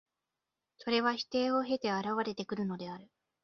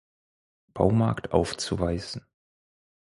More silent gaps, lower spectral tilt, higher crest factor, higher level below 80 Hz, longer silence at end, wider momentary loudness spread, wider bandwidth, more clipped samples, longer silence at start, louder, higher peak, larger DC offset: neither; second, -3 dB/octave vs -6 dB/octave; about the same, 20 dB vs 24 dB; second, -74 dBFS vs -46 dBFS; second, 0.4 s vs 0.95 s; second, 13 LU vs 16 LU; second, 7 kHz vs 11.5 kHz; neither; about the same, 0.8 s vs 0.75 s; second, -33 LUFS vs -26 LUFS; second, -16 dBFS vs -4 dBFS; neither